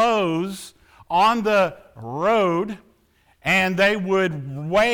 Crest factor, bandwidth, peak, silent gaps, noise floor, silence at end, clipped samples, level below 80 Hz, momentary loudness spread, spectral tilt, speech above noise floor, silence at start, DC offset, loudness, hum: 14 dB; 19 kHz; -8 dBFS; none; -60 dBFS; 0 s; under 0.1%; -54 dBFS; 15 LU; -5 dB/octave; 40 dB; 0 s; under 0.1%; -21 LUFS; none